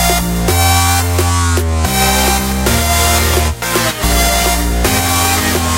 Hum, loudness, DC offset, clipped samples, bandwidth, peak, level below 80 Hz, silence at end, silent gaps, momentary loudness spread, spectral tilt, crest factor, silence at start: none; -12 LUFS; under 0.1%; under 0.1%; 17 kHz; 0 dBFS; -20 dBFS; 0 s; none; 3 LU; -3.5 dB/octave; 12 dB; 0 s